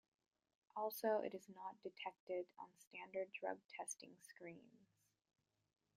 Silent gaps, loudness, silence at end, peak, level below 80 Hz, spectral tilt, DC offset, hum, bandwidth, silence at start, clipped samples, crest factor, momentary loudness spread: 2.20-2.27 s, 2.87-2.91 s, 3.65-3.69 s; -49 LUFS; 1.2 s; -30 dBFS; under -90 dBFS; -3 dB/octave; under 0.1%; none; 15 kHz; 0.75 s; under 0.1%; 22 dB; 17 LU